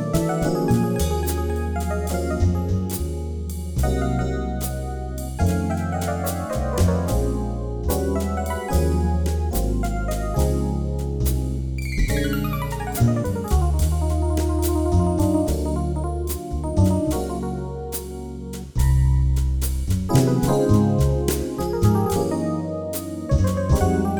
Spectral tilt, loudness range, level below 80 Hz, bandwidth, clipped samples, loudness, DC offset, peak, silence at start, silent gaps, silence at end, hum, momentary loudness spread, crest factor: -6.5 dB/octave; 4 LU; -26 dBFS; over 20 kHz; under 0.1%; -23 LUFS; under 0.1%; -4 dBFS; 0 s; none; 0 s; none; 8 LU; 18 dB